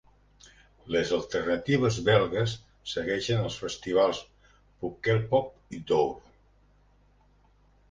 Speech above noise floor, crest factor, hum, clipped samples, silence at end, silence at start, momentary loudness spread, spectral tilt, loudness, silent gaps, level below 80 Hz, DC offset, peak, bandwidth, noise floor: 35 dB; 20 dB; 50 Hz at -55 dBFS; under 0.1%; 1.7 s; 0.85 s; 14 LU; -5.5 dB/octave; -28 LUFS; none; -56 dBFS; under 0.1%; -8 dBFS; 9.6 kHz; -62 dBFS